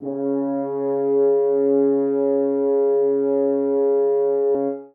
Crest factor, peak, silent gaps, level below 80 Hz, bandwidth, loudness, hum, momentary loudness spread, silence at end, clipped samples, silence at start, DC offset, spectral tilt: 10 dB; -10 dBFS; none; -72 dBFS; 2.2 kHz; -20 LUFS; none; 5 LU; 0.05 s; under 0.1%; 0 s; under 0.1%; -13 dB/octave